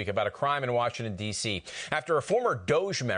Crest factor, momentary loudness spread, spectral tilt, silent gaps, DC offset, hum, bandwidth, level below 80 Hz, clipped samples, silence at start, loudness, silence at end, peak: 18 dB; 6 LU; -4 dB/octave; none; under 0.1%; none; 10.5 kHz; -60 dBFS; under 0.1%; 0 s; -29 LUFS; 0 s; -10 dBFS